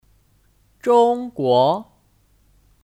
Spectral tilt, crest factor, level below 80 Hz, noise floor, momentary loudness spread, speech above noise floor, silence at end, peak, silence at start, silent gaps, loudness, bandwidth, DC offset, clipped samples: -6.5 dB/octave; 16 dB; -60 dBFS; -59 dBFS; 11 LU; 42 dB; 1.05 s; -4 dBFS; 0.85 s; none; -18 LUFS; 10.5 kHz; under 0.1%; under 0.1%